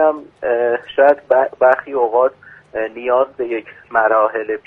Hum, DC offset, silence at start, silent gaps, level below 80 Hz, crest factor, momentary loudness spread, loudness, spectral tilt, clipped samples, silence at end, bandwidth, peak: none; under 0.1%; 0 s; none; -60 dBFS; 16 dB; 11 LU; -16 LUFS; -6.5 dB/octave; under 0.1%; 0.05 s; 4.1 kHz; 0 dBFS